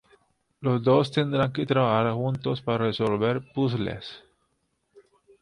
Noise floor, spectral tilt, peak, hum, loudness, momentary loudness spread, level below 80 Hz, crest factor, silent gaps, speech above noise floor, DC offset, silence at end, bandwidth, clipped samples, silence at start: -74 dBFS; -8 dB/octave; -8 dBFS; none; -25 LUFS; 9 LU; -58 dBFS; 18 dB; none; 49 dB; under 0.1%; 1.25 s; 10.5 kHz; under 0.1%; 0.6 s